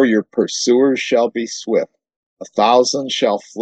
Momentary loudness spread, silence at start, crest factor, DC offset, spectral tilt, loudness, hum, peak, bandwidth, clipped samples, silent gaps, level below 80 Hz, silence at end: 7 LU; 0 s; 16 dB; under 0.1%; -3.5 dB/octave; -16 LUFS; none; 0 dBFS; 9.2 kHz; under 0.1%; 2.16-2.37 s; -70 dBFS; 0 s